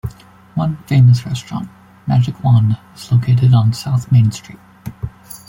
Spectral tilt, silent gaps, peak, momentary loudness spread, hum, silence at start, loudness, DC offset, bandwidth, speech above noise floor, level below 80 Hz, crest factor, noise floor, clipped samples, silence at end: -7.5 dB/octave; none; -2 dBFS; 19 LU; none; 0.05 s; -15 LUFS; under 0.1%; 16.5 kHz; 23 dB; -44 dBFS; 12 dB; -36 dBFS; under 0.1%; 0.1 s